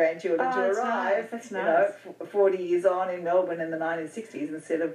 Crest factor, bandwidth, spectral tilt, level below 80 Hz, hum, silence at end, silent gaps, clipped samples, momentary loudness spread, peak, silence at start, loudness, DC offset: 16 dB; 11.5 kHz; -5.5 dB/octave; under -90 dBFS; none; 0 s; none; under 0.1%; 11 LU; -10 dBFS; 0 s; -27 LUFS; under 0.1%